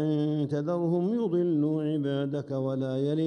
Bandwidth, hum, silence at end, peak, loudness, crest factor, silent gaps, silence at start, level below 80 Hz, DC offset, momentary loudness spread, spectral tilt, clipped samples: 8.8 kHz; none; 0 s; -18 dBFS; -28 LUFS; 10 dB; none; 0 s; -72 dBFS; under 0.1%; 4 LU; -9.5 dB/octave; under 0.1%